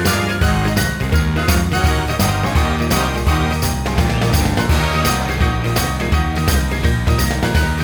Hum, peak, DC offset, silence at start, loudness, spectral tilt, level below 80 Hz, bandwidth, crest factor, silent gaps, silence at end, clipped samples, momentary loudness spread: none; -2 dBFS; under 0.1%; 0 s; -17 LUFS; -5 dB/octave; -20 dBFS; over 20 kHz; 14 dB; none; 0 s; under 0.1%; 2 LU